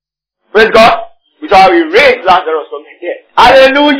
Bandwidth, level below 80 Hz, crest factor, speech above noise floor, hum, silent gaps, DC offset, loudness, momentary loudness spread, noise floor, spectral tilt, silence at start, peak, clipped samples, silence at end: 5.4 kHz; -38 dBFS; 8 dB; 58 dB; none; none; under 0.1%; -6 LUFS; 17 LU; -64 dBFS; -4.5 dB/octave; 0.55 s; 0 dBFS; 5%; 0 s